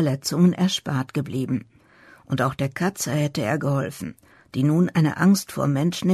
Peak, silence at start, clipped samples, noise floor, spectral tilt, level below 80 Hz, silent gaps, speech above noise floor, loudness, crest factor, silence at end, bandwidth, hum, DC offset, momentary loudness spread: -8 dBFS; 0 s; under 0.1%; -52 dBFS; -6 dB/octave; -58 dBFS; none; 30 dB; -23 LUFS; 14 dB; 0 s; 13.5 kHz; none; under 0.1%; 10 LU